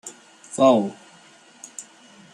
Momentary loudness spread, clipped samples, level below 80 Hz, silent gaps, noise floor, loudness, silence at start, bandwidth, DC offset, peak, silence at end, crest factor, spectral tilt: 23 LU; under 0.1%; -72 dBFS; none; -51 dBFS; -19 LUFS; 0.05 s; 12.5 kHz; under 0.1%; -2 dBFS; 0.5 s; 22 dB; -5 dB/octave